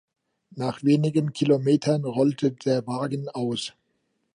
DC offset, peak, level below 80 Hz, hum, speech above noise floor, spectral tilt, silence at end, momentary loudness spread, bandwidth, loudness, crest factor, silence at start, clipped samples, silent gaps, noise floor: under 0.1%; -8 dBFS; -70 dBFS; none; 50 dB; -7 dB/octave; 0.65 s; 10 LU; 10.5 kHz; -24 LUFS; 16 dB; 0.55 s; under 0.1%; none; -73 dBFS